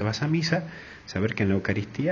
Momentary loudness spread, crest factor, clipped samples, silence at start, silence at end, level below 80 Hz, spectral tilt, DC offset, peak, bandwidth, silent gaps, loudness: 11 LU; 18 dB; under 0.1%; 0 s; 0 s; -48 dBFS; -6 dB/octave; under 0.1%; -8 dBFS; 7.2 kHz; none; -27 LUFS